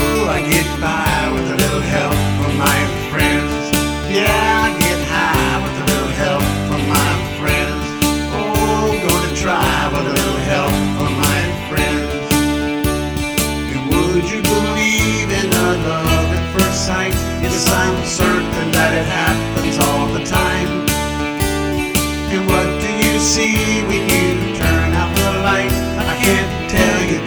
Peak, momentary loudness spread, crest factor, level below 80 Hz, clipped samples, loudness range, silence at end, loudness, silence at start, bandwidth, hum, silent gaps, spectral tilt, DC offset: 0 dBFS; 4 LU; 16 dB; -28 dBFS; under 0.1%; 2 LU; 0 s; -16 LUFS; 0 s; over 20 kHz; none; none; -4 dB/octave; under 0.1%